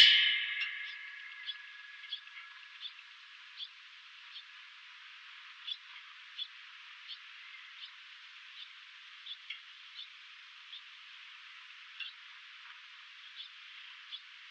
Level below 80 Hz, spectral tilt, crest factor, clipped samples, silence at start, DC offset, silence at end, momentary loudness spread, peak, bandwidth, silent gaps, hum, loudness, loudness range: -82 dBFS; 3.5 dB/octave; 32 dB; under 0.1%; 0 s; under 0.1%; 0 s; 9 LU; -8 dBFS; 9 kHz; none; none; -38 LUFS; 5 LU